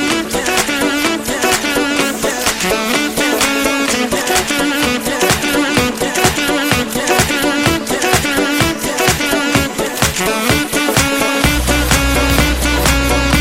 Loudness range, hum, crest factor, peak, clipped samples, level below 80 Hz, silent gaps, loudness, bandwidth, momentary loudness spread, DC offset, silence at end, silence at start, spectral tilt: 1 LU; none; 14 dB; 0 dBFS; under 0.1%; -26 dBFS; none; -14 LUFS; 16.5 kHz; 3 LU; under 0.1%; 0 s; 0 s; -3 dB/octave